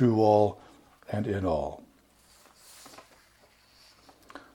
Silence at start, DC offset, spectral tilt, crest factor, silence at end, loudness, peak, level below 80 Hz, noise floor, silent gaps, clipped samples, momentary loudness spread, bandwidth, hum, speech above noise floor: 0 s; under 0.1%; -8 dB/octave; 20 dB; 0.15 s; -27 LUFS; -10 dBFS; -56 dBFS; -61 dBFS; none; under 0.1%; 28 LU; 17.5 kHz; none; 36 dB